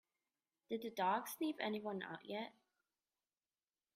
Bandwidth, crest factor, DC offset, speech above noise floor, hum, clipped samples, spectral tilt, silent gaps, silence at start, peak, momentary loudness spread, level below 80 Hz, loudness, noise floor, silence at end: 15 kHz; 22 dB; under 0.1%; over 47 dB; none; under 0.1%; -4.5 dB/octave; none; 0.7 s; -24 dBFS; 9 LU; under -90 dBFS; -43 LUFS; under -90 dBFS; 1.45 s